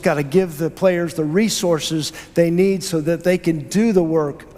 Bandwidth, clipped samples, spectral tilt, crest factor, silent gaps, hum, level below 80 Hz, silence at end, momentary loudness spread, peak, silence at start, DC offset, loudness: 16 kHz; under 0.1%; -5.5 dB/octave; 14 dB; none; none; -50 dBFS; 0.05 s; 5 LU; -4 dBFS; 0 s; under 0.1%; -19 LUFS